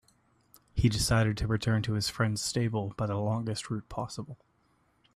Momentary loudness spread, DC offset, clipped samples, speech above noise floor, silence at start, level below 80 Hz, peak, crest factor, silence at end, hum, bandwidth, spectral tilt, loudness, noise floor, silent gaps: 11 LU; under 0.1%; under 0.1%; 40 dB; 0.75 s; -46 dBFS; -14 dBFS; 16 dB; 0.8 s; none; 14.5 kHz; -5 dB/octave; -30 LUFS; -70 dBFS; none